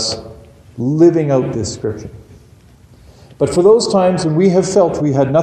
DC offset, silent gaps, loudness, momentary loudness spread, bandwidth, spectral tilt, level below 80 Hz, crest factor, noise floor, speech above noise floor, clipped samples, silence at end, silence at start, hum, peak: under 0.1%; none; -14 LUFS; 13 LU; 10 kHz; -6 dB/octave; -44 dBFS; 14 dB; -44 dBFS; 31 dB; under 0.1%; 0 s; 0 s; none; 0 dBFS